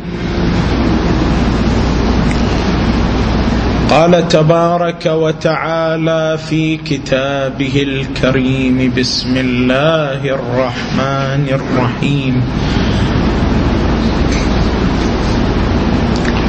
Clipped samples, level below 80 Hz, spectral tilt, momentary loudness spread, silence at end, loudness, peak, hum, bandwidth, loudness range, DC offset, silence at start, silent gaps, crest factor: under 0.1%; -22 dBFS; -6.5 dB/octave; 4 LU; 0 s; -13 LUFS; 0 dBFS; none; 8.6 kHz; 2 LU; under 0.1%; 0 s; none; 12 dB